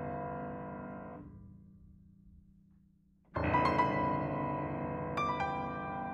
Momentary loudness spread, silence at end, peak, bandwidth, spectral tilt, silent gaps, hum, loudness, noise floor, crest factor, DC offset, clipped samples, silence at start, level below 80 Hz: 18 LU; 0 s; -16 dBFS; 11 kHz; -7.5 dB/octave; none; none; -35 LUFS; -67 dBFS; 20 dB; under 0.1%; under 0.1%; 0 s; -58 dBFS